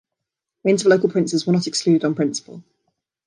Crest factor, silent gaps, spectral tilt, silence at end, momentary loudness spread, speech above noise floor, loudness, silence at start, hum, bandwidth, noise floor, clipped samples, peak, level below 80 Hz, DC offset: 16 dB; none; -5 dB/octave; 0.65 s; 8 LU; 64 dB; -19 LUFS; 0.65 s; none; 11 kHz; -83 dBFS; under 0.1%; -4 dBFS; -68 dBFS; under 0.1%